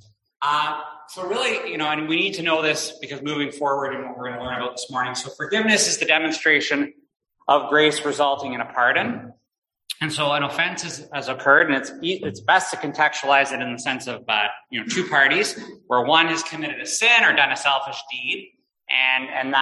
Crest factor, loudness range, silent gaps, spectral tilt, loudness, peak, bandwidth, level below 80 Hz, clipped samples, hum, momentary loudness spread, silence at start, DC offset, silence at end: 20 dB; 5 LU; 9.58-9.62 s; -2 dB/octave; -20 LUFS; -2 dBFS; 12.5 kHz; -66 dBFS; under 0.1%; none; 13 LU; 0.4 s; under 0.1%; 0 s